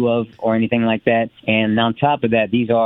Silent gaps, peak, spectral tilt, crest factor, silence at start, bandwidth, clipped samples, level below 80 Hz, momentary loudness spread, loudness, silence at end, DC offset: none; -2 dBFS; -9.5 dB/octave; 16 dB; 0 s; 4 kHz; under 0.1%; -54 dBFS; 3 LU; -18 LUFS; 0 s; under 0.1%